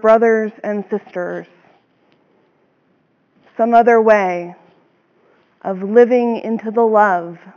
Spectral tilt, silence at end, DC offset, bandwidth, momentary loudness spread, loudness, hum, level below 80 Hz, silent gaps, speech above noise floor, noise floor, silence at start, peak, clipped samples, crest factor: -7.5 dB/octave; 0.05 s; under 0.1%; 6.8 kHz; 15 LU; -15 LUFS; none; -68 dBFS; none; 45 dB; -60 dBFS; 0.05 s; 0 dBFS; under 0.1%; 16 dB